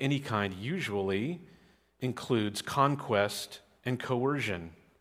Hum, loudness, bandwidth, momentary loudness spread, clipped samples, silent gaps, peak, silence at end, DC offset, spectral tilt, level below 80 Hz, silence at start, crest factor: none; -32 LUFS; 16 kHz; 11 LU; under 0.1%; none; -12 dBFS; 0.25 s; under 0.1%; -5.5 dB/octave; -68 dBFS; 0 s; 20 dB